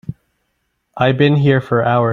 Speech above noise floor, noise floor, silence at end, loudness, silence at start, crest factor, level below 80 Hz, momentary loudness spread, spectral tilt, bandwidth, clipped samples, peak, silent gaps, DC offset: 55 dB; -69 dBFS; 0 s; -14 LUFS; 0.1 s; 14 dB; -50 dBFS; 5 LU; -9 dB/octave; 4.4 kHz; under 0.1%; -2 dBFS; none; under 0.1%